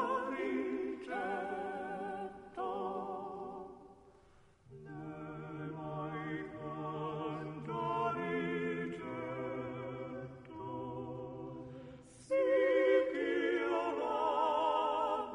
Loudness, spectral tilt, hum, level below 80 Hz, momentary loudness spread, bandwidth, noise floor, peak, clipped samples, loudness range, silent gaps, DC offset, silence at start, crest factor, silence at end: -37 LUFS; -7 dB/octave; none; -70 dBFS; 16 LU; 10.5 kHz; -64 dBFS; -18 dBFS; under 0.1%; 12 LU; none; under 0.1%; 0 s; 18 dB; 0 s